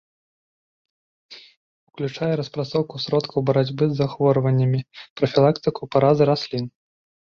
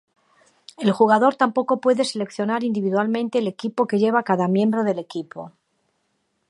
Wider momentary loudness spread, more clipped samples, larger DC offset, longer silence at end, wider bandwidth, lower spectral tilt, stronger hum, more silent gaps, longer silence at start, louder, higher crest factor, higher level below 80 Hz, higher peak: about the same, 10 LU vs 12 LU; neither; neither; second, 0.7 s vs 1 s; second, 7 kHz vs 11.5 kHz; first, -8 dB/octave vs -6 dB/octave; neither; first, 1.57-1.87 s, 5.10-5.16 s vs none; first, 1.3 s vs 0.8 s; about the same, -21 LUFS vs -21 LUFS; about the same, 18 dB vs 18 dB; first, -58 dBFS vs -74 dBFS; about the same, -4 dBFS vs -2 dBFS